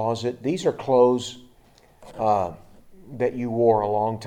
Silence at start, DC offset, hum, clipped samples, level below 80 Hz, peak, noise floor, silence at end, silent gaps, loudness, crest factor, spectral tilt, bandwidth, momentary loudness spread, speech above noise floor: 0 s; under 0.1%; none; under 0.1%; -58 dBFS; -6 dBFS; -55 dBFS; 0 s; none; -23 LUFS; 18 dB; -6.5 dB/octave; 10 kHz; 13 LU; 33 dB